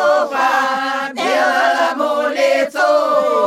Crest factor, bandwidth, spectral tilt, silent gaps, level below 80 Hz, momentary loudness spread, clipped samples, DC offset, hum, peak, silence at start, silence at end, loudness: 12 dB; 14.5 kHz; -2 dB/octave; none; -70 dBFS; 4 LU; under 0.1%; under 0.1%; none; -2 dBFS; 0 s; 0 s; -15 LUFS